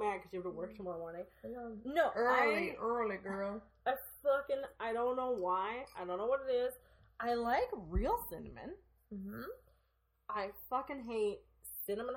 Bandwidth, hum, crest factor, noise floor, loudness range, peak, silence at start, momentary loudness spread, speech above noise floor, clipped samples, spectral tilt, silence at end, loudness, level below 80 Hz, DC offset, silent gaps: 17 kHz; none; 20 dB; -77 dBFS; 7 LU; -20 dBFS; 0 s; 15 LU; 40 dB; under 0.1%; -5.5 dB/octave; 0 s; -38 LUFS; -54 dBFS; under 0.1%; none